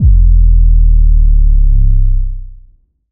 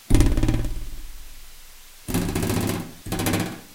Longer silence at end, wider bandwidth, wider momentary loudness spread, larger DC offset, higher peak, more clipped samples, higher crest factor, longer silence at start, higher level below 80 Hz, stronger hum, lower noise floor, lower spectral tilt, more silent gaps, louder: first, 0.6 s vs 0 s; second, 0.4 kHz vs 17 kHz; second, 9 LU vs 23 LU; neither; about the same, 0 dBFS vs 0 dBFS; neither; second, 6 dB vs 24 dB; about the same, 0 s vs 0.1 s; first, -8 dBFS vs -28 dBFS; neither; about the same, -44 dBFS vs -44 dBFS; first, -15.5 dB/octave vs -5.5 dB/octave; neither; first, -12 LUFS vs -25 LUFS